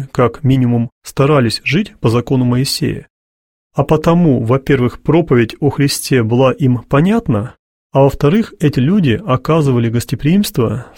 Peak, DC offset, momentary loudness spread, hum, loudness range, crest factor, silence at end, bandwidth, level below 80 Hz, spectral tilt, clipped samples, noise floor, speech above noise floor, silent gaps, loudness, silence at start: 0 dBFS; under 0.1%; 6 LU; none; 2 LU; 14 dB; 0.1 s; 16.5 kHz; -38 dBFS; -6.5 dB/octave; under 0.1%; under -90 dBFS; over 77 dB; 0.92-1.01 s, 3.10-3.70 s, 7.59-7.90 s; -14 LUFS; 0 s